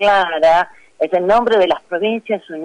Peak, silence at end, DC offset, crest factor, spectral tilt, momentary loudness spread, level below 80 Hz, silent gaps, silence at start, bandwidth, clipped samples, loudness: -6 dBFS; 0 s; under 0.1%; 10 dB; -5 dB/octave; 10 LU; -50 dBFS; none; 0 s; 10 kHz; under 0.1%; -16 LUFS